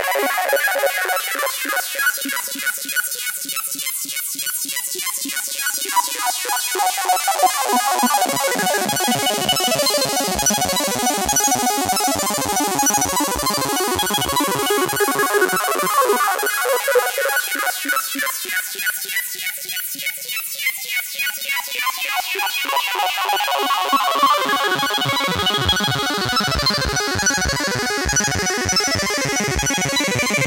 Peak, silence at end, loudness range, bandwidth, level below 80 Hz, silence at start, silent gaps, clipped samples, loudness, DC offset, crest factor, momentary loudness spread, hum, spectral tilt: -2 dBFS; 0 s; 4 LU; 17 kHz; -42 dBFS; 0 s; none; under 0.1%; -18 LUFS; under 0.1%; 18 dB; 6 LU; none; -1.5 dB/octave